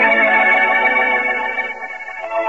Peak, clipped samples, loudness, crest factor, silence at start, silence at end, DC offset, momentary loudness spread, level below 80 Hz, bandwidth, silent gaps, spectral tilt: -4 dBFS; under 0.1%; -14 LUFS; 12 dB; 0 s; 0 s; 0.4%; 15 LU; -58 dBFS; 7.8 kHz; none; -3.5 dB/octave